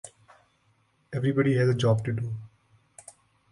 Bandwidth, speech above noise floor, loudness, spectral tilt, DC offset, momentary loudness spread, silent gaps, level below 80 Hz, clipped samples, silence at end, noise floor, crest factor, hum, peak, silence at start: 11.5 kHz; 43 dB; -26 LUFS; -7 dB/octave; under 0.1%; 25 LU; none; -60 dBFS; under 0.1%; 1.05 s; -68 dBFS; 16 dB; none; -12 dBFS; 0.05 s